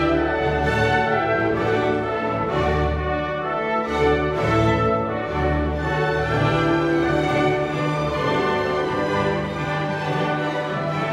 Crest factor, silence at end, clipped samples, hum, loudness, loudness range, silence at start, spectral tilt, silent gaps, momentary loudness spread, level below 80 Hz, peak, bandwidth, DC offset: 14 dB; 0 s; under 0.1%; none; -21 LUFS; 1 LU; 0 s; -7 dB/octave; none; 5 LU; -34 dBFS; -6 dBFS; 11.5 kHz; under 0.1%